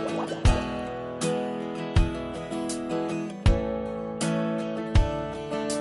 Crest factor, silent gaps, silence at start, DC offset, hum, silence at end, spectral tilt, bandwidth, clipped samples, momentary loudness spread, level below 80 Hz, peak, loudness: 18 dB; none; 0 s; under 0.1%; none; 0 s; -6 dB/octave; 11.5 kHz; under 0.1%; 7 LU; -32 dBFS; -8 dBFS; -28 LUFS